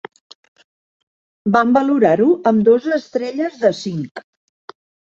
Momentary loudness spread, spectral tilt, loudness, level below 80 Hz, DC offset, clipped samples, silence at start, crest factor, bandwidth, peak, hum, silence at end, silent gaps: 12 LU; -7 dB/octave; -16 LUFS; -62 dBFS; under 0.1%; under 0.1%; 1.45 s; 16 dB; 7.6 kHz; -2 dBFS; none; 0.95 s; 4.11-4.15 s